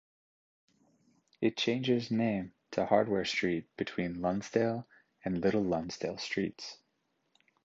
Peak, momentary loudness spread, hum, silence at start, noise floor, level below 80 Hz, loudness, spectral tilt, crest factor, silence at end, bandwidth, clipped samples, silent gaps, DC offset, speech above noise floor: -12 dBFS; 9 LU; none; 1.4 s; -78 dBFS; -64 dBFS; -33 LUFS; -5.5 dB/octave; 22 dB; 0.9 s; 7.8 kHz; under 0.1%; none; under 0.1%; 47 dB